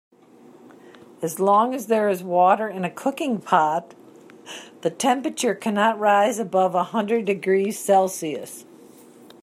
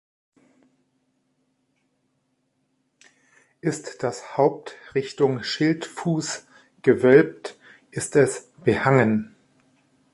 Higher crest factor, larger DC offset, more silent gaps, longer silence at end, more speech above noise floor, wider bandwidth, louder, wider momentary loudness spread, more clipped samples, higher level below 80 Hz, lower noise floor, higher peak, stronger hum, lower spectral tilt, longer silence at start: about the same, 18 dB vs 22 dB; neither; neither; about the same, 0.8 s vs 0.85 s; second, 29 dB vs 50 dB; first, 15.5 kHz vs 11.5 kHz; about the same, -21 LUFS vs -22 LUFS; second, 12 LU vs 15 LU; neither; second, -76 dBFS vs -62 dBFS; second, -50 dBFS vs -72 dBFS; about the same, -4 dBFS vs -2 dBFS; neither; about the same, -4.5 dB/octave vs -5.5 dB/octave; second, 1.2 s vs 3.65 s